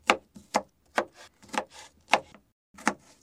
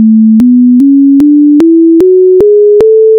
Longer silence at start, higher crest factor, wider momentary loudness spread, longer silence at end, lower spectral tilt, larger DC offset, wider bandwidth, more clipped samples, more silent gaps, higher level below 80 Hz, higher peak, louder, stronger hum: about the same, 0.05 s vs 0 s; first, 28 dB vs 4 dB; first, 16 LU vs 0 LU; first, 0.3 s vs 0 s; second, -2 dB/octave vs -10 dB/octave; neither; first, 16 kHz vs 4.4 kHz; second, under 0.1% vs 0.5%; first, 2.52-2.74 s vs none; second, -66 dBFS vs -42 dBFS; second, -4 dBFS vs 0 dBFS; second, -31 LUFS vs -4 LUFS; neither